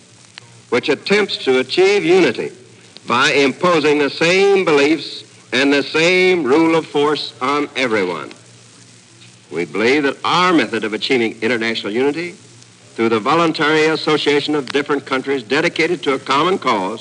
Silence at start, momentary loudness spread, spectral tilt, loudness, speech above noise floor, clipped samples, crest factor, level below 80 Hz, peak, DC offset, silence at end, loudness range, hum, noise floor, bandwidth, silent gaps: 0.7 s; 8 LU; -4.5 dB/octave; -15 LUFS; 28 dB; under 0.1%; 12 dB; -70 dBFS; -4 dBFS; under 0.1%; 0 s; 4 LU; none; -44 dBFS; 10.5 kHz; none